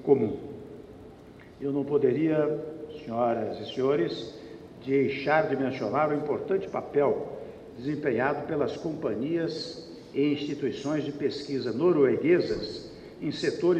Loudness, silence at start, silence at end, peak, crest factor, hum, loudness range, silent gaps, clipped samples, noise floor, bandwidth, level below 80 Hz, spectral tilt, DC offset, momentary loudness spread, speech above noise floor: -28 LUFS; 0 s; 0 s; -8 dBFS; 20 dB; none; 3 LU; none; under 0.1%; -49 dBFS; 8.6 kHz; -60 dBFS; -7 dB/octave; under 0.1%; 17 LU; 22 dB